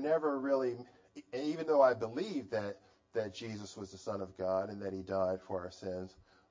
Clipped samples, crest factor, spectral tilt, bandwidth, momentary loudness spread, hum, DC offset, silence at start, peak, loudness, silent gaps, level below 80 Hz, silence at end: under 0.1%; 22 dB; -6 dB/octave; 7.6 kHz; 15 LU; none; under 0.1%; 0 s; -14 dBFS; -36 LUFS; none; -66 dBFS; 0.4 s